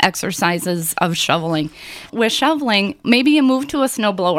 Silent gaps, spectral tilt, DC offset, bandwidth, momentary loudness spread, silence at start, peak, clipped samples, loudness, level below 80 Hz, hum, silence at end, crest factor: none; -4 dB/octave; under 0.1%; 16.5 kHz; 8 LU; 0 s; 0 dBFS; under 0.1%; -17 LUFS; -54 dBFS; none; 0 s; 16 dB